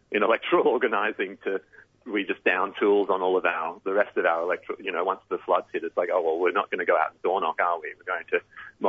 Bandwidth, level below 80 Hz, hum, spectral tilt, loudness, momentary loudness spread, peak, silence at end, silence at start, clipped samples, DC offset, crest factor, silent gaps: 4.9 kHz; -74 dBFS; none; -6.5 dB/octave; -26 LUFS; 9 LU; -8 dBFS; 0 s; 0.1 s; under 0.1%; under 0.1%; 18 dB; none